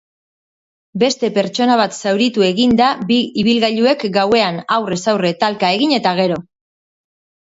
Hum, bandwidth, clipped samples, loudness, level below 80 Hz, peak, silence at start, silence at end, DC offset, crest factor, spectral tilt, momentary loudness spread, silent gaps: none; 8 kHz; under 0.1%; -15 LUFS; -54 dBFS; 0 dBFS; 0.95 s; 1 s; under 0.1%; 16 dB; -4.5 dB/octave; 4 LU; none